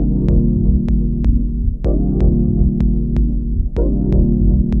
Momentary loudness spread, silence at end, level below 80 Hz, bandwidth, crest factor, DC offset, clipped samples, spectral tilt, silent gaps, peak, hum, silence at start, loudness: 4 LU; 0 s; -16 dBFS; 2.5 kHz; 12 dB; under 0.1%; under 0.1%; -12 dB/octave; none; -2 dBFS; none; 0 s; -17 LUFS